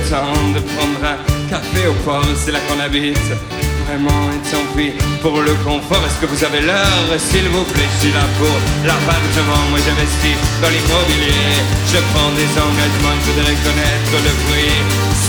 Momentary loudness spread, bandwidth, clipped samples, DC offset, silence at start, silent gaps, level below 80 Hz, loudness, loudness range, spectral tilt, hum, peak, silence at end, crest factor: 5 LU; over 20 kHz; under 0.1%; under 0.1%; 0 s; none; -22 dBFS; -14 LUFS; 3 LU; -4 dB/octave; none; 0 dBFS; 0 s; 14 dB